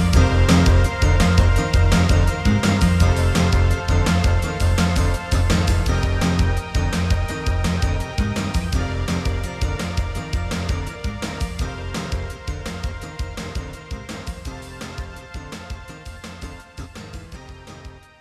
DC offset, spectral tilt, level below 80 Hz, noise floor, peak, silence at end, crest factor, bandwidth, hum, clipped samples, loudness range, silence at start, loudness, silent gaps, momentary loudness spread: under 0.1%; -5.5 dB/octave; -24 dBFS; -40 dBFS; -2 dBFS; 0.2 s; 16 dB; 13.5 kHz; none; under 0.1%; 17 LU; 0 s; -20 LUFS; none; 19 LU